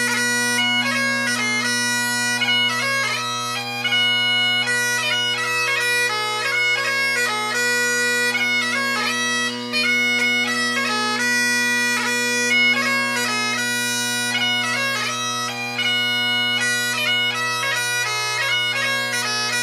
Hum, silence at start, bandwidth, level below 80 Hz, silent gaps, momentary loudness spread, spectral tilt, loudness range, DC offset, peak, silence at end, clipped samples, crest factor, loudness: none; 0 s; 15.5 kHz; -74 dBFS; none; 4 LU; -1 dB/octave; 1 LU; under 0.1%; -8 dBFS; 0 s; under 0.1%; 12 dB; -18 LUFS